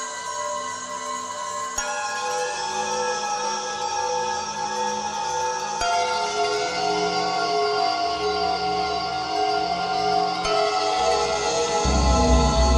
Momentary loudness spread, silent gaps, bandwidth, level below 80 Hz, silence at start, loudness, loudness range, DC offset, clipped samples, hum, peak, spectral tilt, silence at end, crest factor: 7 LU; none; 12.5 kHz; -32 dBFS; 0 s; -23 LUFS; 4 LU; under 0.1%; under 0.1%; none; -6 dBFS; -3.5 dB/octave; 0 s; 16 dB